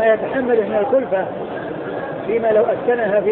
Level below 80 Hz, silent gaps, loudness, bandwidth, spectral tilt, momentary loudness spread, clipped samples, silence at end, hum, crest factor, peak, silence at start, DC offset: -56 dBFS; none; -19 LUFS; 4.2 kHz; -10.5 dB/octave; 10 LU; under 0.1%; 0 s; none; 14 dB; -4 dBFS; 0 s; under 0.1%